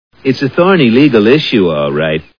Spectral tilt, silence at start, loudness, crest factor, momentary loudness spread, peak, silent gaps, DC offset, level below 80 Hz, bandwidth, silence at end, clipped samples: -7.5 dB/octave; 0.25 s; -10 LUFS; 10 dB; 7 LU; 0 dBFS; none; 0.5%; -44 dBFS; 5.4 kHz; 0.2 s; 0.4%